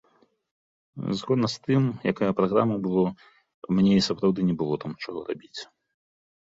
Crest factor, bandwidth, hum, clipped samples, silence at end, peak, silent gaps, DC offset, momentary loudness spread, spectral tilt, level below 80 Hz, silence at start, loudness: 18 dB; 7.8 kHz; none; under 0.1%; 0.85 s; -8 dBFS; 3.54-3.62 s; under 0.1%; 14 LU; -7 dB/octave; -58 dBFS; 0.95 s; -25 LUFS